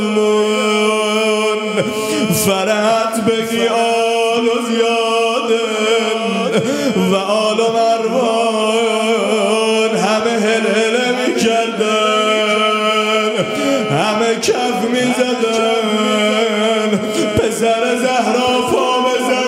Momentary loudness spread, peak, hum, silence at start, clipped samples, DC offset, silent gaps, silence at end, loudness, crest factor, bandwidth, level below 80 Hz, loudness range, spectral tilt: 2 LU; -2 dBFS; none; 0 s; under 0.1%; under 0.1%; none; 0 s; -15 LUFS; 14 dB; 16 kHz; -54 dBFS; 1 LU; -3.5 dB/octave